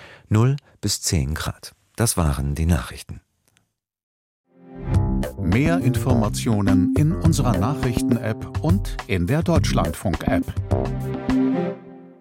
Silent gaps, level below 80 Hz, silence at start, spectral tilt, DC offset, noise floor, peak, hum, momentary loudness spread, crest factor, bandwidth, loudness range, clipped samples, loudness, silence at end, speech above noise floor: 4.03-4.44 s; -32 dBFS; 0 s; -6 dB/octave; under 0.1%; -67 dBFS; -4 dBFS; none; 9 LU; 18 dB; 16.5 kHz; 6 LU; under 0.1%; -22 LUFS; 0.1 s; 47 dB